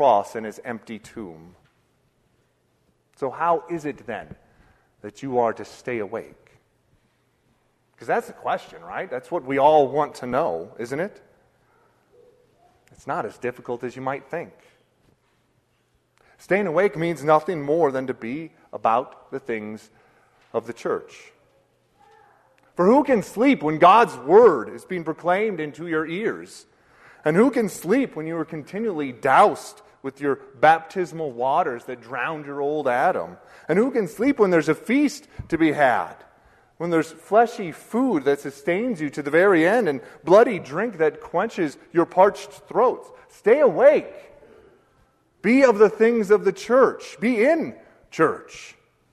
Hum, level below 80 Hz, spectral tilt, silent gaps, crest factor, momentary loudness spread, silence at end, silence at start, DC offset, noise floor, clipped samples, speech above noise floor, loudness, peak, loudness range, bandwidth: none; -62 dBFS; -6 dB/octave; none; 20 dB; 18 LU; 0.4 s; 0 s; under 0.1%; -66 dBFS; under 0.1%; 45 dB; -21 LUFS; -2 dBFS; 13 LU; 13.5 kHz